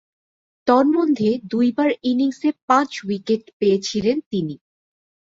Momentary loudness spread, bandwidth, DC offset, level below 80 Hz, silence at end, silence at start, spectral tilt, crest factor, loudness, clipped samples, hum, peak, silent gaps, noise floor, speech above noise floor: 9 LU; 7.8 kHz; under 0.1%; -62 dBFS; 0.75 s; 0.65 s; -5.5 dB/octave; 18 dB; -20 LUFS; under 0.1%; none; -2 dBFS; 2.62-2.68 s, 3.53-3.60 s, 4.26-4.31 s; under -90 dBFS; over 71 dB